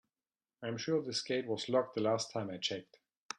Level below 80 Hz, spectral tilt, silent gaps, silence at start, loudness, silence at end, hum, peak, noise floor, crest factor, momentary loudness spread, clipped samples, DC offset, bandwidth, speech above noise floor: -80 dBFS; -4 dB/octave; 3.17-3.29 s; 0.6 s; -36 LUFS; 0.05 s; none; -18 dBFS; under -90 dBFS; 20 dB; 8 LU; under 0.1%; under 0.1%; 11.5 kHz; over 54 dB